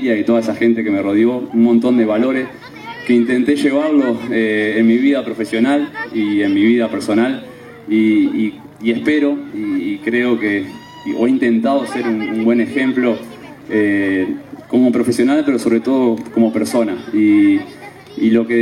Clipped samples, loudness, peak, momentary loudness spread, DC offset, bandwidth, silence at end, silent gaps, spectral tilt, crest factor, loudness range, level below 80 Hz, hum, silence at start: under 0.1%; -15 LUFS; -2 dBFS; 9 LU; under 0.1%; 12.5 kHz; 0 s; none; -6 dB/octave; 12 dB; 2 LU; -58 dBFS; none; 0 s